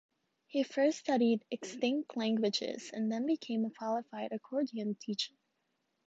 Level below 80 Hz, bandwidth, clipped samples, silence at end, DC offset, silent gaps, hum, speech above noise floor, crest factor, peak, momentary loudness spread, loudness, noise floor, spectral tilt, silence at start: -84 dBFS; 8 kHz; under 0.1%; 0.8 s; under 0.1%; none; none; 47 dB; 16 dB; -20 dBFS; 8 LU; -35 LUFS; -81 dBFS; -4.5 dB/octave; 0.55 s